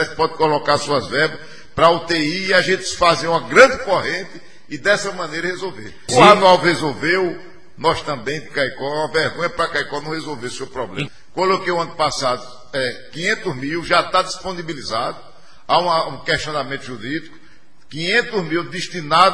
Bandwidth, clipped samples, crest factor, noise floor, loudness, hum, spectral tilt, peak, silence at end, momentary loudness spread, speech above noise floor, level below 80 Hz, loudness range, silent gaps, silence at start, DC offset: 11 kHz; under 0.1%; 18 dB; -52 dBFS; -18 LUFS; none; -4 dB/octave; 0 dBFS; 0 s; 15 LU; 33 dB; -50 dBFS; 6 LU; none; 0 s; 2%